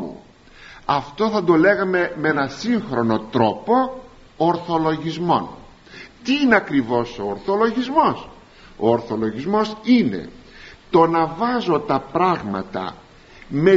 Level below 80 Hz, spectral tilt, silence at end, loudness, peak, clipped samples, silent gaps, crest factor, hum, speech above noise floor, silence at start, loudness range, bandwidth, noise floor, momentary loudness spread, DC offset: -50 dBFS; -4.5 dB/octave; 0 s; -20 LUFS; -2 dBFS; under 0.1%; none; 18 dB; none; 26 dB; 0 s; 2 LU; 7.6 kHz; -45 dBFS; 13 LU; under 0.1%